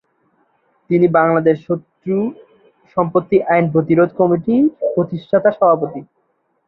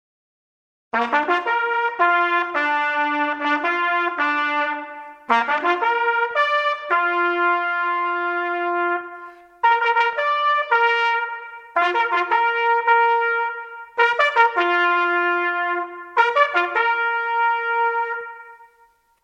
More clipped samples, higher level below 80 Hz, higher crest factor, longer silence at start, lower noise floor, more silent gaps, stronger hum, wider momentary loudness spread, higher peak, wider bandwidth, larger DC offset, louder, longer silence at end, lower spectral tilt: neither; first, -58 dBFS vs -76 dBFS; about the same, 14 dB vs 18 dB; about the same, 0.9 s vs 0.95 s; first, -65 dBFS vs -58 dBFS; neither; neither; about the same, 10 LU vs 8 LU; about the same, -2 dBFS vs -2 dBFS; second, 4.2 kHz vs 8 kHz; neither; first, -16 LUFS vs -19 LUFS; about the same, 0.65 s vs 0.6 s; first, -11.5 dB/octave vs -2.5 dB/octave